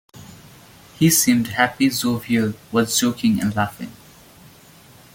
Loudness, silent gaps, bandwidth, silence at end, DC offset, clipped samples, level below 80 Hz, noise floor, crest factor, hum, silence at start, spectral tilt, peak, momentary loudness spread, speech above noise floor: -19 LUFS; none; 17 kHz; 1.2 s; under 0.1%; under 0.1%; -56 dBFS; -47 dBFS; 20 dB; none; 0.15 s; -4 dB/octave; -2 dBFS; 9 LU; 28 dB